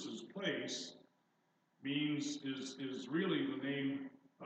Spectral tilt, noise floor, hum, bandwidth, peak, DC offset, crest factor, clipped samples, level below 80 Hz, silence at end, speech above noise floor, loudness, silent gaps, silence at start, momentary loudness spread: -4.5 dB/octave; -78 dBFS; none; 8.8 kHz; -24 dBFS; under 0.1%; 18 dB; under 0.1%; under -90 dBFS; 0 s; 39 dB; -41 LUFS; none; 0 s; 10 LU